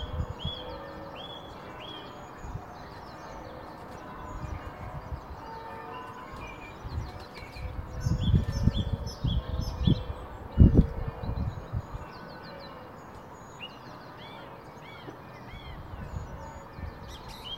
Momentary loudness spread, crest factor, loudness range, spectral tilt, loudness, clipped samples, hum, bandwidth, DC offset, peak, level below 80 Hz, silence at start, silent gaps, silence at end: 17 LU; 28 dB; 16 LU; -7 dB/octave; -34 LUFS; under 0.1%; none; 15.5 kHz; under 0.1%; -4 dBFS; -38 dBFS; 0 s; none; 0 s